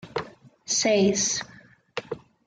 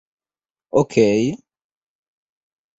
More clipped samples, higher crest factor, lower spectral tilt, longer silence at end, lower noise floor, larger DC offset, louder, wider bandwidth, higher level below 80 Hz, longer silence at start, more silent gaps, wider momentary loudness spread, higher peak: neither; about the same, 18 dB vs 20 dB; second, -3 dB/octave vs -6.5 dB/octave; second, 0.3 s vs 1.45 s; second, -44 dBFS vs under -90 dBFS; neither; second, -24 LUFS vs -18 LUFS; first, 10 kHz vs 8 kHz; about the same, -62 dBFS vs -58 dBFS; second, 0.05 s vs 0.75 s; neither; first, 22 LU vs 10 LU; second, -10 dBFS vs -2 dBFS